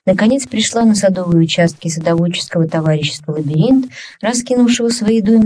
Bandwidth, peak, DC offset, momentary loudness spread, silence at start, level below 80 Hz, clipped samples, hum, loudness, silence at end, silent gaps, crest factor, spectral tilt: 11 kHz; 0 dBFS; under 0.1%; 6 LU; 0.05 s; -48 dBFS; under 0.1%; none; -14 LUFS; 0 s; none; 12 dB; -5.5 dB/octave